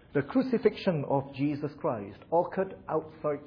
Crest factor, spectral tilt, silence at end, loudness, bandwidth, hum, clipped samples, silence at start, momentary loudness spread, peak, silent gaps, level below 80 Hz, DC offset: 18 dB; -9.5 dB/octave; 0 s; -30 LUFS; 5.4 kHz; none; under 0.1%; 0.15 s; 7 LU; -12 dBFS; none; -64 dBFS; under 0.1%